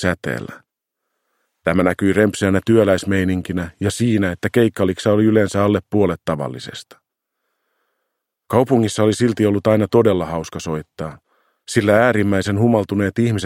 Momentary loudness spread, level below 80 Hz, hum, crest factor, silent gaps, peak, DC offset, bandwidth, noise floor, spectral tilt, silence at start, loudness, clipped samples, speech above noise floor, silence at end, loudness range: 12 LU; -50 dBFS; none; 18 dB; none; 0 dBFS; under 0.1%; 16.5 kHz; -78 dBFS; -6.5 dB/octave; 0 s; -18 LUFS; under 0.1%; 61 dB; 0 s; 4 LU